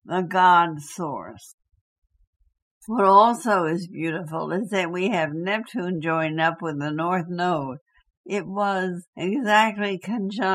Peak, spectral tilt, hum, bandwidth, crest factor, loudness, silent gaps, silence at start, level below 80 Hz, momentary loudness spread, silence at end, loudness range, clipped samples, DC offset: -4 dBFS; -5.5 dB/octave; none; 15 kHz; 20 dB; -23 LUFS; 1.54-1.58 s, 1.81-2.02 s, 2.27-2.40 s, 2.62-2.81 s, 7.81-7.86 s, 8.17-8.24 s, 9.07-9.13 s; 0.05 s; -68 dBFS; 14 LU; 0 s; 4 LU; under 0.1%; under 0.1%